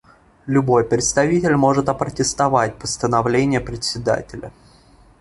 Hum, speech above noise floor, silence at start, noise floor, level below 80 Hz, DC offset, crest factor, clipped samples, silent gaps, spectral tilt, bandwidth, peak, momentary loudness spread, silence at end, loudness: none; 32 dB; 0.45 s; -50 dBFS; -44 dBFS; under 0.1%; 16 dB; under 0.1%; none; -5 dB/octave; 11.5 kHz; -2 dBFS; 8 LU; 0.7 s; -18 LUFS